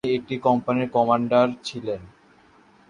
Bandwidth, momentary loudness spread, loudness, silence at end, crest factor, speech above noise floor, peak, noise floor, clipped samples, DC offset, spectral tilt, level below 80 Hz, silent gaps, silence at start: 10.5 kHz; 12 LU; -23 LUFS; 0.8 s; 18 dB; 33 dB; -6 dBFS; -55 dBFS; under 0.1%; under 0.1%; -6.5 dB/octave; -60 dBFS; none; 0.05 s